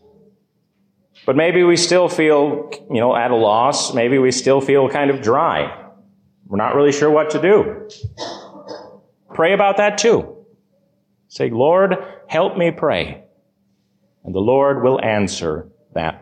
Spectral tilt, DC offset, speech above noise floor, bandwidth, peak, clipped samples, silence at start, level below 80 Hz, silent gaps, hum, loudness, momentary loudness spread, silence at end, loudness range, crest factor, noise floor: -4.5 dB/octave; under 0.1%; 48 dB; 10.5 kHz; -4 dBFS; under 0.1%; 1.25 s; -50 dBFS; none; none; -16 LUFS; 15 LU; 0.05 s; 4 LU; 14 dB; -64 dBFS